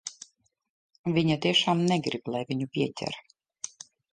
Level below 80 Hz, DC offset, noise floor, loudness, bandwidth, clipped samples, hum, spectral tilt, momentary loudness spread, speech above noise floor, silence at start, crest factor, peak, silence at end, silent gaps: -66 dBFS; under 0.1%; -54 dBFS; -27 LUFS; 9.8 kHz; under 0.1%; none; -5 dB/octave; 18 LU; 27 dB; 0.05 s; 18 dB; -10 dBFS; 0.45 s; 0.69-0.89 s, 0.99-1.04 s